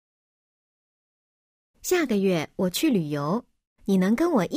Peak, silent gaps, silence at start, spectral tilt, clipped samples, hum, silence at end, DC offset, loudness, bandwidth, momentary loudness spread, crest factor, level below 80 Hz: -10 dBFS; 3.67-3.76 s; 1.85 s; -5.5 dB/octave; under 0.1%; none; 0 s; under 0.1%; -24 LUFS; 16 kHz; 8 LU; 16 dB; -60 dBFS